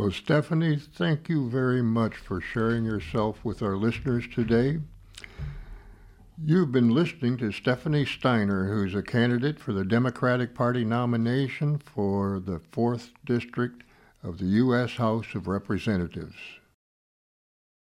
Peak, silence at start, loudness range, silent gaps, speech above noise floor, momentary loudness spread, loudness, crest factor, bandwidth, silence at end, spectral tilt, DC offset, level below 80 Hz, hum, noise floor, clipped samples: -10 dBFS; 0 s; 3 LU; none; 24 dB; 11 LU; -27 LUFS; 16 dB; 11.5 kHz; 1.4 s; -8 dB/octave; under 0.1%; -52 dBFS; none; -50 dBFS; under 0.1%